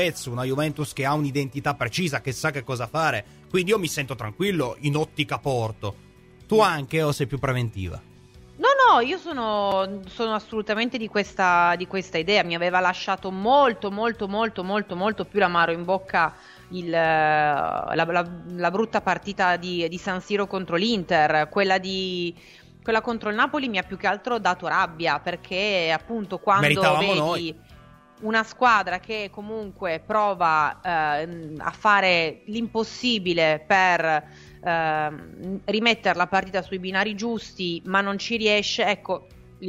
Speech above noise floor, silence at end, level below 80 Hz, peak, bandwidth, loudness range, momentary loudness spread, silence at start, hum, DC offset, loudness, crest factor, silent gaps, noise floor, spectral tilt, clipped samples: 26 dB; 0 s; -54 dBFS; -4 dBFS; 16 kHz; 3 LU; 10 LU; 0 s; none; under 0.1%; -23 LUFS; 20 dB; none; -49 dBFS; -4.5 dB/octave; under 0.1%